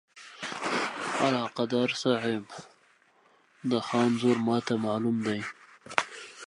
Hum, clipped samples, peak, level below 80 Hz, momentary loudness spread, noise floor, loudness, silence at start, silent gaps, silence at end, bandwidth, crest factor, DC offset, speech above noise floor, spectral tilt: none; under 0.1%; -2 dBFS; -74 dBFS; 14 LU; -64 dBFS; -29 LUFS; 0.15 s; none; 0 s; 11.5 kHz; 28 dB; under 0.1%; 36 dB; -5 dB/octave